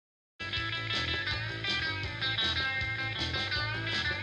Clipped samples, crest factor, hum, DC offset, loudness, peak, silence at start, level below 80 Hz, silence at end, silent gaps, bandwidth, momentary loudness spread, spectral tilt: under 0.1%; 14 dB; none; under 0.1%; -31 LUFS; -18 dBFS; 0.4 s; -50 dBFS; 0 s; none; 11 kHz; 5 LU; -3.5 dB/octave